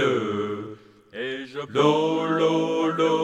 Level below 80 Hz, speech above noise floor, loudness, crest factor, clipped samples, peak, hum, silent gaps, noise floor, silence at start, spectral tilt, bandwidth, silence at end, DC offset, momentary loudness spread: -72 dBFS; 22 dB; -24 LUFS; 16 dB; under 0.1%; -8 dBFS; none; none; -43 dBFS; 0 s; -6 dB/octave; 10 kHz; 0 s; under 0.1%; 13 LU